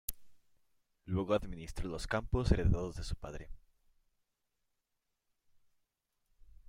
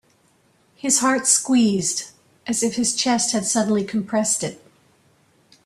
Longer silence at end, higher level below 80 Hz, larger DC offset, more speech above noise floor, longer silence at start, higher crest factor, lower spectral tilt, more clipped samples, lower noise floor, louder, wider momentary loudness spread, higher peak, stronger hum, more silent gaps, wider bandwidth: first, 3.1 s vs 1.1 s; first, -44 dBFS vs -62 dBFS; neither; first, 50 dB vs 40 dB; second, 0.1 s vs 0.85 s; about the same, 24 dB vs 20 dB; first, -6.5 dB/octave vs -2.5 dB/octave; neither; first, -85 dBFS vs -60 dBFS; second, -37 LUFS vs -20 LUFS; first, 15 LU vs 12 LU; second, -14 dBFS vs -2 dBFS; neither; neither; first, 16 kHz vs 14 kHz